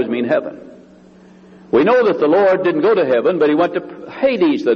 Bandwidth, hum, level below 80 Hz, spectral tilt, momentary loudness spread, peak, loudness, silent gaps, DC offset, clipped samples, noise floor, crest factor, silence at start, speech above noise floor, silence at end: 6.8 kHz; none; -60 dBFS; -7.5 dB/octave; 7 LU; -2 dBFS; -15 LUFS; none; under 0.1%; under 0.1%; -44 dBFS; 14 dB; 0 s; 29 dB; 0 s